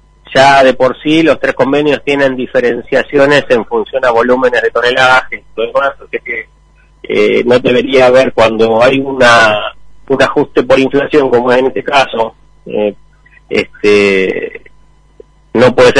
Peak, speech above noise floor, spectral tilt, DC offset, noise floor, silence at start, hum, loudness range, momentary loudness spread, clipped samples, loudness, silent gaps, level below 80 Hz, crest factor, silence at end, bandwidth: 0 dBFS; 35 dB; -5 dB/octave; under 0.1%; -45 dBFS; 0.3 s; none; 4 LU; 11 LU; 0.4%; -10 LUFS; none; -40 dBFS; 10 dB; 0 s; 10.5 kHz